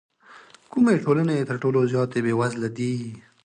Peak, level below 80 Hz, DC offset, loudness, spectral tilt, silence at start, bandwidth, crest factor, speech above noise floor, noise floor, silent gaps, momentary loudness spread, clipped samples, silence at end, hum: -8 dBFS; -64 dBFS; under 0.1%; -23 LUFS; -7.5 dB/octave; 0.3 s; 9.8 kHz; 16 dB; 28 dB; -50 dBFS; none; 9 LU; under 0.1%; 0.25 s; none